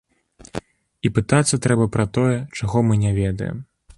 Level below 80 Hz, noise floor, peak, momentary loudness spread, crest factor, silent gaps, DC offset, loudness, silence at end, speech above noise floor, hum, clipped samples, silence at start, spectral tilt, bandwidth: -42 dBFS; -49 dBFS; -2 dBFS; 17 LU; 18 dB; none; under 0.1%; -20 LUFS; 0.35 s; 30 dB; none; under 0.1%; 0.55 s; -6 dB/octave; 11.5 kHz